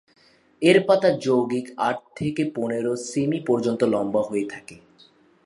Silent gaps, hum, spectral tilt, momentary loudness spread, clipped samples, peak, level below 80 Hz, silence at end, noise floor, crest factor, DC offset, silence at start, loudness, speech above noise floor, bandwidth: none; none; -5.5 dB/octave; 10 LU; under 0.1%; -2 dBFS; -64 dBFS; 0.7 s; -56 dBFS; 20 dB; under 0.1%; 0.6 s; -23 LUFS; 34 dB; 11.5 kHz